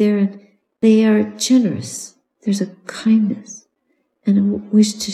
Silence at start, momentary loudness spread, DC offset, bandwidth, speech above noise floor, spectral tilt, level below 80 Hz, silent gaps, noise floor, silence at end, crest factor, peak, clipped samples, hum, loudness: 0 s; 16 LU; under 0.1%; 12.5 kHz; 51 dB; -5.5 dB/octave; -62 dBFS; none; -67 dBFS; 0 s; 14 dB; -2 dBFS; under 0.1%; none; -17 LUFS